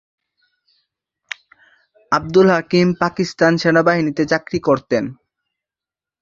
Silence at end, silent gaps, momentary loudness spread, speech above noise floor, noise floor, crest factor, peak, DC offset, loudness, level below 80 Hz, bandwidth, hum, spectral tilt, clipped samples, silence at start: 1.1 s; none; 18 LU; 73 dB; -89 dBFS; 18 dB; -2 dBFS; under 0.1%; -16 LUFS; -54 dBFS; 7.6 kHz; none; -6 dB/octave; under 0.1%; 2.1 s